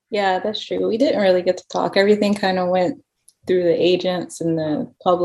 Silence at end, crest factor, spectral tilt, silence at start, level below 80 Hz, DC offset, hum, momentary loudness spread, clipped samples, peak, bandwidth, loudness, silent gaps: 0 s; 16 dB; -5.5 dB/octave; 0.1 s; -62 dBFS; under 0.1%; none; 8 LU; under 0.1%; -2 dBFS; 12 kHz; -19 LUFS; none